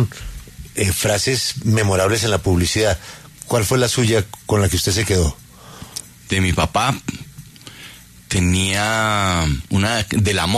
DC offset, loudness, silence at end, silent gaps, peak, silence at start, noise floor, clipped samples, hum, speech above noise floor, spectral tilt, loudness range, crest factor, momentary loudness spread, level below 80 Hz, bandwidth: under 0.1%; -18 LUFS; 0 s; none; -4 dBFS; 0 s; -41 dBFS; under 0.1%; none; 23 dB; -4 dB/octave; 4 LU; 16 dB; 20 LU; -34 dBFS; 13.5 kHz